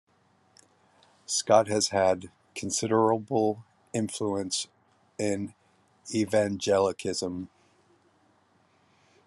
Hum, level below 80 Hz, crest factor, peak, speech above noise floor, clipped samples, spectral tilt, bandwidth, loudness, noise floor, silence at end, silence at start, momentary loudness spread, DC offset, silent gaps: none; -74 dBFS; 22 dB; -6 dBFS; 39 dB; under 0.1%; -4 dB/octave; 12.5 kHz; -27 LUFS; -66 dBFS; 1.8 s; 1.3 s; 17 LU; under 0.1%; none